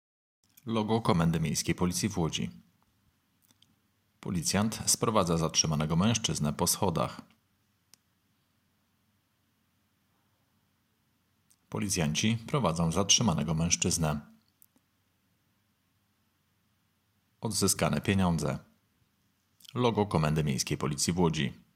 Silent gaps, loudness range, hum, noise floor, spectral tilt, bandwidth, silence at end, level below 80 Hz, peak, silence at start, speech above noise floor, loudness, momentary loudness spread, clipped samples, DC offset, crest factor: none; 8 LU; none; -74 dBFS; -4 dB/octave; 16 kHz; 0.25 s; -56 dBFS; -10 dBFS; 0.65 s; 45 dB; -29 LUFS; 10 LU; under 0.1%; under 0.1%; 22 dB